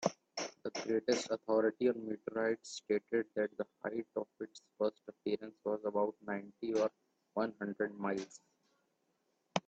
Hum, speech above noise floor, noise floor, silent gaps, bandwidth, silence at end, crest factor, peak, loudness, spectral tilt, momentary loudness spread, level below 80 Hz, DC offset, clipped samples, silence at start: none; 43 dB; -80 dBFS; none; 8.6 kHz; 0.05 s; 24 dB; -14 dBFS; -38 LUFS; -4.5 dB/octave; 9 LU; -82 dBFS; under 0.1%; under 0.1%; 0 s